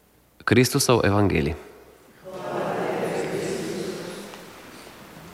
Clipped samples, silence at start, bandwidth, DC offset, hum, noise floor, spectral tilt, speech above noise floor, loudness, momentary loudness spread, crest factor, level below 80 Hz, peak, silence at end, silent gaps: under 0.1%; 0.45 s; 16.5 kHz; under 0.1%; none; -50 dBFS; -5 dB/octave; 30 dB; -24 LUFS; 23 LU; 20 dB; -48 dBFS; -6 dBFS; 0 s; none